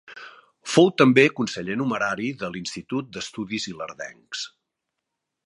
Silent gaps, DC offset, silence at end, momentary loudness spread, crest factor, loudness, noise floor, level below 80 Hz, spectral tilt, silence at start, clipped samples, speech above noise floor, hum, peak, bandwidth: none; under 0.1%; 1 s; 20 LU; 22 dB; -23 LUFS; -82 dBFS; -64 dBFS; -5 dB/octave; 0.1 s; under 0.1%; 59 dB; none; -2 dBFS; 11.5 kHz